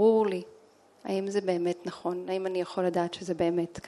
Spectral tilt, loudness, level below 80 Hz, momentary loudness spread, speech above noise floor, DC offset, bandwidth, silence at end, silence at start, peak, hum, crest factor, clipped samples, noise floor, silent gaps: -6.5 dB/octave; -30 LUFS; -68 dBFS; 7 LU; 28 dB; under 0.1%; 12 kHz; 0 s; 0 s; -12 dBFS; none; 16 dB; under 0.1%; -58 dBFS; none